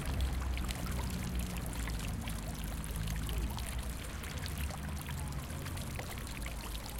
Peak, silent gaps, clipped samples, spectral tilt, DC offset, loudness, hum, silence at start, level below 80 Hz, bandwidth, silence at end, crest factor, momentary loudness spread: -18 dBFS; none; under 0.1%; -4.5 dB/octave; under 0.1%; -40 LUFS; none; 0 s; -40 dBFS; 17 kHz; 0 s; 20 dB; 4 LU